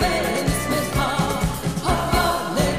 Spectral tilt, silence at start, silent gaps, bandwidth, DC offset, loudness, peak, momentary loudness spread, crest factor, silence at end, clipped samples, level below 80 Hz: -4.5 dB/octave; 0 s; none; 15.5 kHz; 0.6%; -22 LUFS; -6 dBFS; 3 LU; 16 dB; 0 s; under 0.1%; -32 dBFS